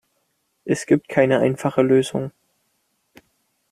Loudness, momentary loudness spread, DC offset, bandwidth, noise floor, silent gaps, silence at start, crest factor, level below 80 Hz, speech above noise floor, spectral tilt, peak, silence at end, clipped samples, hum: -19 LUFS; 12 LU; under 0.1%; 14.5 kHz; -70 dBFS; none; 0.65 s; 20 dB; -62 dBFS; 51 dB; -6.5 dB/octave; -2 dBFS; 1.4 s; under 0.1%; none